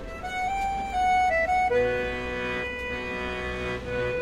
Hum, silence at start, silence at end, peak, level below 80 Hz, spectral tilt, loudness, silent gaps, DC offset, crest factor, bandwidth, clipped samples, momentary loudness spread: none; 0 s; 0 s; -14 dBFS; -42 dBFS; -5 dB/octave; -27 LUFS; none; under 0.1%; 12 dB; 15 kHz; under 0.1%; 8 LU